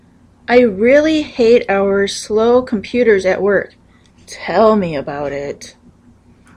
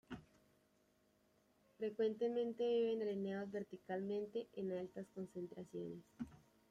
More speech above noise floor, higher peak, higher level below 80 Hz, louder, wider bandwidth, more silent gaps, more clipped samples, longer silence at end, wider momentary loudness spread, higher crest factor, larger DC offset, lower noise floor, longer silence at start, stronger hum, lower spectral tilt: about the same, 34 dB vs 34 dB; first, 0 dBFS vs -28 dBFS; first, -46 dBFS vs -80 dBFS; first, -14 LUFS vs -44 LUFS; first, 11 kHz vs 9.6 kHz; neither; neither; first, 0.85 s vs 0.35 s; about the same, 16 LU vs 14 LU; about the same, 14 dB vs 16 dB; neither; second, -47 dBFS vs -77 dBFS; first, 0.5 s vs 0.1 s; neither; second, -5 dB/octave vs -7.5 dB/octave